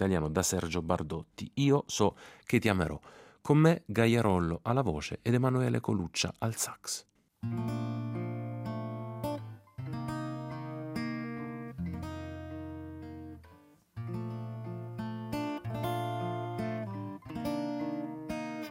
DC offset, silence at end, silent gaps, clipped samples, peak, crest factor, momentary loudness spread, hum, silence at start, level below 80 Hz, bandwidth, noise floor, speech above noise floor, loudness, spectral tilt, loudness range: under 0.1%; 0 s; none; under 0.1%; -12 dBFS; 22 dB; 15 LU; none; 0 s; -58 dBFS; 16 kHz; -59 dBFS; 29 dB; -33 LUFS; -5.5 dB/octave; 12 LU